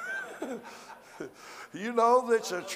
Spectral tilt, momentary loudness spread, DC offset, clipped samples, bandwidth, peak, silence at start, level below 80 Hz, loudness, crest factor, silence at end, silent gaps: -3 dB/octave; 22 LU; under 0.1%; under 0.1%; 15.5 kHz; -12 dBFS; 0 s; -78 dBFS; -28 LUFS; 18 dB; 0 s; none